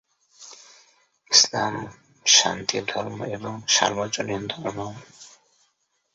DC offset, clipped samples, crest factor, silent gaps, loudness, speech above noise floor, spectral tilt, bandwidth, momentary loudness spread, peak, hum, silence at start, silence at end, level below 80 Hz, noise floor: under 0.1%; under 0.1%; 26 dB; none; -21 LUFS; 46 dB; -1 dB/octave; 8.2 kHz; 20 LU; 0 dBFS; none; 0.4 s; 0.85 s; -62 dBFS; -71 dBFS